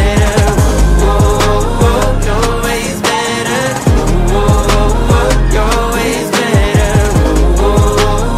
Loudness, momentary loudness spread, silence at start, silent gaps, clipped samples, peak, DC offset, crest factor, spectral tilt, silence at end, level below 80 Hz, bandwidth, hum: -12 LUFS; 3 LU; 0 s; none; under 0.1%; 0 dBFS; under 0.1%; 10 dB; -5 dB/octave; 0 s; -14 dBFS; 15.5 kHz; none